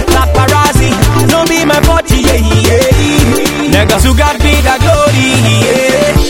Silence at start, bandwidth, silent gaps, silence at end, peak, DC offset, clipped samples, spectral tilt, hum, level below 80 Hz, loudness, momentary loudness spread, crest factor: 0 s; 19.5 kHz; none; 0 s; 0 dBFS; 2%; 1%; -4.5 dB/octave; none; -14 dBFS; -8 LUFS; 1 LU; 8 dB